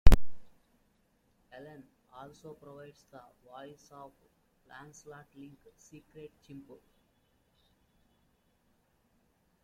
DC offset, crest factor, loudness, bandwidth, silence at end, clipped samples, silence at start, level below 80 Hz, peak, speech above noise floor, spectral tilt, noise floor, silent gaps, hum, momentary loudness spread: under 0.1%; 28 dB; -42 LUFS; 14.5 kHz; 9.25 s; under 0.1%; 0.05 s; -36 dBFS; -2 dBFS; 20 dB; -6.5 dB/octave; -72 dBFS; none; none; 6 LU